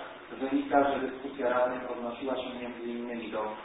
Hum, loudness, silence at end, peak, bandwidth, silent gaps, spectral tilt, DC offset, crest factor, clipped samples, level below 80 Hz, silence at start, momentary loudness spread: none; -32 LUFS; 0 s; -10 dBFS; 3.9 kHz; none; -0.5 dB/octave; under 0.1%; 20 dB; under 0.1%; -64 dBFS; 0 s; 11 LU